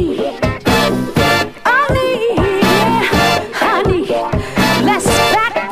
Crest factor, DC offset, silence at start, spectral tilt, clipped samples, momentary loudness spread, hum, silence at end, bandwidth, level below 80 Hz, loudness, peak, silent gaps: 14 dB; under 0.1%; 0 s; -4.5 dB/octave; under 0.1%; 5 LU; none; 0 s; 15.5 kHz; -30 dBFS; -13 LUFS; 0 dBFS; none